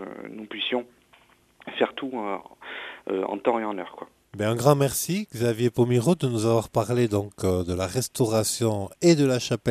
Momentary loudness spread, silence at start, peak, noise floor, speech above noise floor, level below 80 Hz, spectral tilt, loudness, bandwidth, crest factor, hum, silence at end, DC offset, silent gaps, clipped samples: 16 LU; 0 s; -4 dBFS; -58 dBFS; 34 dB; -56 dBFS; -5.5 dB/octave; -25 LUFS; 15 kHz; 22 dB; none; 0 s; under 0.1%; none; under 0.1%